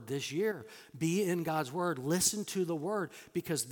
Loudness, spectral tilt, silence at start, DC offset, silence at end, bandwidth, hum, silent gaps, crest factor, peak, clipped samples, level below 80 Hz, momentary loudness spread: -34 LUFS; -4 dB/octave; 0 s; under 0.1%; 0 s; 18 kHz; none; none; 20 dB; -14 dBFS; under 0.1%; -72 dBFS; 9 LU